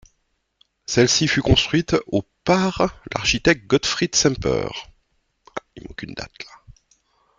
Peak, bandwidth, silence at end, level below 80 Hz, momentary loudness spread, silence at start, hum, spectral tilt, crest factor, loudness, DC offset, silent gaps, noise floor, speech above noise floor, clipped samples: -2 dBFS; 10 kHz; 0.65 s; -40 dBFS; 19 LU; 0.9 s; none; -4 dB/octave; 20 dB; -19 LUFS; under 0.1%; none; -70 dBFS; 50 dB; under 0.1%